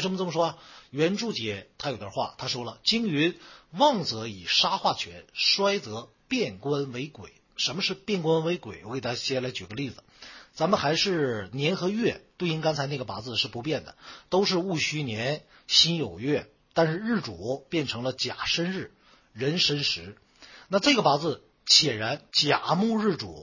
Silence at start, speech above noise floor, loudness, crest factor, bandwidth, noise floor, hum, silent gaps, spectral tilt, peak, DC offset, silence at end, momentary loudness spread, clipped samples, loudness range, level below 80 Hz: 0 s; 22 dB; -26 LUFS; 24 dB; 7.4 kHz; -49 dBFS; none; none; -4 dB/octave; -4 dBFS; under 0.1%; 0 s; 13 LU; under 0.1%; 5 LU; -60 dBFS